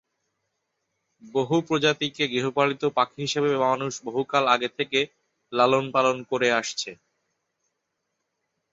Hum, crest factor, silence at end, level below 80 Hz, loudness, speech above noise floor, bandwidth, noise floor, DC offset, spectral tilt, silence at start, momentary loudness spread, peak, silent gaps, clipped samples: none; 22 dB; 1.8 s; -70 dBFS; -24 LUFS; 55 dB; 8 kHz; -79 dBFS; under 0.1%; -4 dB/octave; 1.25 s; 9 LU; -4 dBFS; none; under 0.1%